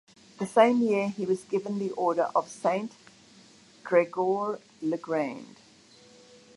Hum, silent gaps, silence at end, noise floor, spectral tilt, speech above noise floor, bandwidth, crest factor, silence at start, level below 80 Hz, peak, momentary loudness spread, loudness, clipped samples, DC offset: none; none; 1.1 s; -56 dBFS; -6 dB/octave; 29 dB; 11.5 kHz; 22 dB; 0.4 s; -78 dBFS; -6 dBFS; 12 LU; -27 LUFS; under 0.1%; under 0.1%